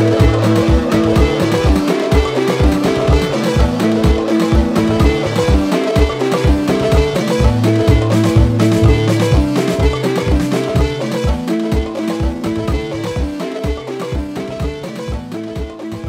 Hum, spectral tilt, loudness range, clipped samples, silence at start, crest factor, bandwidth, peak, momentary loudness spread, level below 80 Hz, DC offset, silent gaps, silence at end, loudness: none; -6.5 dB/octave; 7 LU; under 0.1%; 0 s; 14 dB; 15.5 kHz; 0 dBFS; 10 LU; -20 dBFS; under 0.1%; none; 0 s; -15 LUFS